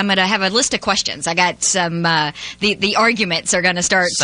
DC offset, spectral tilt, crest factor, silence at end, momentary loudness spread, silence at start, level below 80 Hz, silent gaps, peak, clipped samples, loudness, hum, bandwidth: under 0.1%; -2 dB/octave; 16 dB; 0 s; 4 LU; 0 s; -50 dBFS; none; -2 dBFS; under 0.1%; -16 LUFS; none; 10.5 kHz